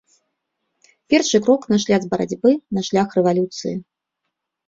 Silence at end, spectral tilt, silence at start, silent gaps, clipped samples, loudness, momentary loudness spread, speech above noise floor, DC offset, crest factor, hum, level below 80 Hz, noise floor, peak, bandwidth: 0.85 s; -5 dB/octave; 1.1 s; none; under 0.1%; -19 LUFS; 9 LU; 61 dB; under 0.1%; 18 dB; none; -60 dBFS; -79 dBFS; -2 dBFS; 7.8 kHz